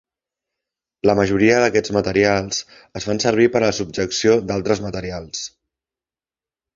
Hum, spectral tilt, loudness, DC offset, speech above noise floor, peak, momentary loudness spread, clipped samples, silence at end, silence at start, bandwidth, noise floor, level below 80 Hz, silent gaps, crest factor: none; -4.5 dB/octave; -18 LUFS; under 0.1%; over 72 dB; -2 dBFS; 13 LU; under 0.1%; 1.3 s; 1.05 s; 7.6 kHz; under -90 dBFS; -46 dBFS; none; 18 dB